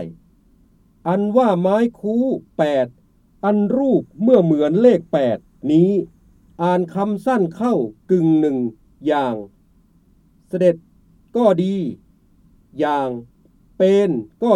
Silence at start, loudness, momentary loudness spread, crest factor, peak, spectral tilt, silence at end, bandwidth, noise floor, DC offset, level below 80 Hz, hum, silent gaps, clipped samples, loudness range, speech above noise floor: 0 s; -18 LUFS; 12 LU; 16 dB; -2 dBFS; -8.5 dB/octave; 0 s; 11 kHz; -55 dBFS; under 0.1%; -56 dBFS; none; none; under 0.1%; 5 LU; 38 dB